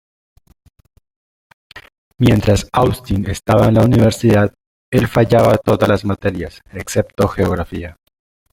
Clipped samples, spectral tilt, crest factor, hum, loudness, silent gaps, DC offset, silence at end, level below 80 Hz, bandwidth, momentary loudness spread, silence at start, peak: under 0.1%; -7 dB/octave; 16 dB; none; -15 LUFS; 1.98-2.11 s, 4.67-4.92 s; under 0.1%; 0.6 s; -36 dBFS; 16.5 kHz; 12 LU; 1.75 s; 0 dBFS